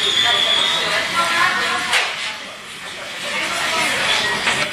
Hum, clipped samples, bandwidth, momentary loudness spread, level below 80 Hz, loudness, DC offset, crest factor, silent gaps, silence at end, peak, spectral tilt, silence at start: none; under 0.1%; 14 kHz; 15 LU; -56 dBFS; -17 LUFS; under 0.1%; 16 dB; none; 0 s; -2 dBFS; -0.5 dB/octave; 0 s